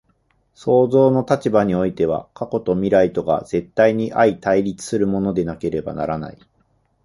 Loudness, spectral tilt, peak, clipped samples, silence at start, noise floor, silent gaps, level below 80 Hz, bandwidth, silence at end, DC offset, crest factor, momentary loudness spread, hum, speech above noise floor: -19 LUFS; -7 dB/octave; -2 dBFS; under 0.1%; 0.6 s; -63 dBFS; none; -48 dBFS; 11.5 kHz; 0.75 s; under 0.1%; 18 dB; 9 LU; none; 45 dB